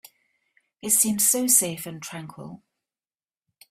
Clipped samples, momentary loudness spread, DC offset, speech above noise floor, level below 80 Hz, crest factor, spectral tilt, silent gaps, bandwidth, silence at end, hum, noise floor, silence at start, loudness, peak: under 0.1%; 22 LU; under 0.1%; over 66 dB; -68 dBFS; 22 dB; -2.5 dB/octave; none; 16 kHz; 1.15 s; none; under -90 dBFS; 0.85 s; -19 LUFS; -6 dBFS